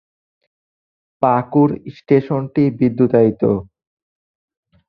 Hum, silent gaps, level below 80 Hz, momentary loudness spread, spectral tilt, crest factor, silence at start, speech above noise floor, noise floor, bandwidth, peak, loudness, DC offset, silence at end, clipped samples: none; none; -52 dBFS; 6 LU; -11.5 dB/octave; 16 dB; 1.2 s; over 75 dB; under -90 dBFS; 5.2 kHz; -2 dBFS; -16 LUFS; under 0.1%; 1.25 s; under 0.1%